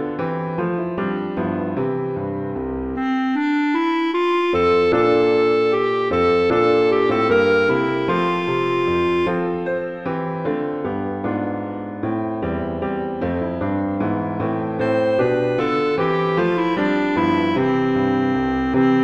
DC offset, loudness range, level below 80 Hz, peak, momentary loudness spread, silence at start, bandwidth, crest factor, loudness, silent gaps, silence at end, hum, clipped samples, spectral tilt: under 0.1%; 7 LU; -46 dBFS; -6 dBFS; 8 LU; 0 s; 8.2 kHz; 14 dB; -20 LUFS; none; 0 s; none; under 0.1%; -7.5 dB/octave